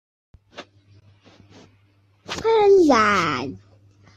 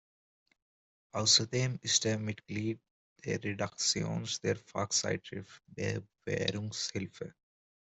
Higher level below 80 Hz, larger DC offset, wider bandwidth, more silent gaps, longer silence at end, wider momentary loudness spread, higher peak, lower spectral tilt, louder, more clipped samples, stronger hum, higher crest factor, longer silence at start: first, -56 dBFS vs -68 dBFS; neither; about the same, 8.6 kHz vs 8.2 kHz; second, none vs 2.91-3.16 s; about the same, 0.6 s vs 0.6 s; about the same, 17 LU vs 18 LU; first, -6 dBFS vs -12 dBFS; first, -4.5 dB/octave vs -3 dB/octave; first, -17 LUFS vs -32 LUFS; neither; neither; second, 16 dB vs 24 dB; second, 0.55 s vs 1.15 s